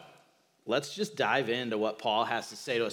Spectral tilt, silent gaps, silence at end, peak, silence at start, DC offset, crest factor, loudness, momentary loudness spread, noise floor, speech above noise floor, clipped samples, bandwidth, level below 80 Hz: -3.5 dB/octave; none; 0 s; -14 dBFS; 0 s; under 0.1%; 18 dB; -31 LUFS; 6 LU; -65 dBFS; 34 dB; under 0.1%; 17.5 kHz; under -90 dBFS